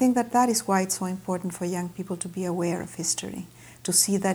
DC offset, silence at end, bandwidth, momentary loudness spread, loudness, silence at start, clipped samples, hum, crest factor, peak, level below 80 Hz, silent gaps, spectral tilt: under 0.1%; 0 s; over 20 kHz; 12 LU; -26 LUFS; 0 s; under 0.1%; none; 20 dB; -8 dBFS; -62 dBFS; none; -4 dB/octave